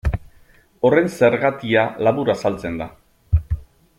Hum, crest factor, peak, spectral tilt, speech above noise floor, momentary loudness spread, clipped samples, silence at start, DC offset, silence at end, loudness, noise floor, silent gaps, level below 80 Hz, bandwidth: none; 18 dB; -2 dBFS; -7 dB/octave; 33 dB; 13 LU; under 0.1%; 0.05 s; under 0.1%; 0.35 s; -20 LUFS; -51 dBFS; none; -32 dBFS; 14.5 kHz